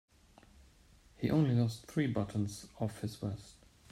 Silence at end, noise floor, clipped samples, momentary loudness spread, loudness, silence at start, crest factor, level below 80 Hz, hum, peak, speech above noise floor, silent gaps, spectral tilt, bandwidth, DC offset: 0.4 s; -63 dBFS; under 0.1%; 11 LU; -35 LUFS; 1.2 s; 18 dB; -62 dBFS; none; -20 dBFS; 29 dB; none; -7 dB/octave; 14.5 kHz; under 0.1%